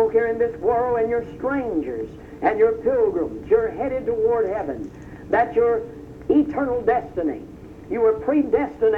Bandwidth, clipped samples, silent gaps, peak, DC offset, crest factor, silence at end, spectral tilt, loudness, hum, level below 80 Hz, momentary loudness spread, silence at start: 4 kHz; under 0.1%; none; -6 dBFS; under 0.1%; 16 dB; 0 s; -8.5 dB/octave; -22 LUFS; none; -48 dBFS; 13 LU; 0 s